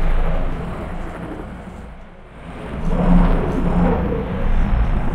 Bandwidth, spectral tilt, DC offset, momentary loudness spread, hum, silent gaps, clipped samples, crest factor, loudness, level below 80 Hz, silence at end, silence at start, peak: 4.3 kHz; -9 dB/octave; under 0.1%; 19 LU; none; none; under 0.1%; 16 dB; -21 LUFS; -20 dBFS; 0 s; 0 s; -2 dBFS